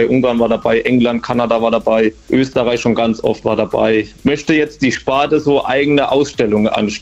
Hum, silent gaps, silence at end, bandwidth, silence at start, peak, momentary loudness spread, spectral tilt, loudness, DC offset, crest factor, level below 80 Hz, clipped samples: none; none; 0 s; 8.2 kHz; 0 s; 0 dBFS; 3 LU; -5.5 dB/octave; -14 LUFS; under 0.1%; 14 dB; -42 dBFS; under 0.1%